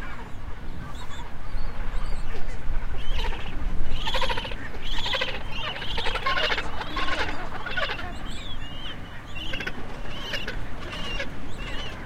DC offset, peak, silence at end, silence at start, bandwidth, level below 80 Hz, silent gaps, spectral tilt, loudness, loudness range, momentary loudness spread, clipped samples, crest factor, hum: under 0.1%; -8 dBFS; 0 s; 0 s; 8.4 kHz; -30 dBFS; none; -4 dB/octave; -31 LUFS; 7 LU; 12 LU; under 0.1%; 14 dB; none